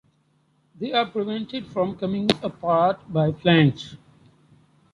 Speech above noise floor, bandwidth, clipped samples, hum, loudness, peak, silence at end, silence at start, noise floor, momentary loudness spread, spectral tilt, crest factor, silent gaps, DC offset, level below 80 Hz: 42 dB; 11.5 kHz; under 0.1%; none; -23 LUFS; -2 dBFS; 0.95 s; 0.8 s; -65 dBFS; 12 LU; -7 dB/octave; 24 dB; none; under 0.1%; -58 dBFS